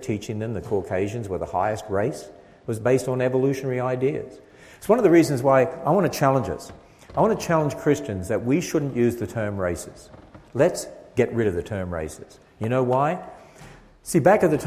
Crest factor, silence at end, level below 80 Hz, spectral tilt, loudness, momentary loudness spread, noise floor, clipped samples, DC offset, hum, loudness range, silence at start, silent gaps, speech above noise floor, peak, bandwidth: 20 dB; 0 s; -48 dBFS; -6.5 dB/octave; -23 LUFS; 15 LU; -47 dBFS; under 0.1%; under 0.1%; none; 5 LU; 0 s; none; 24 dB; -4 dBFS; 16 kHz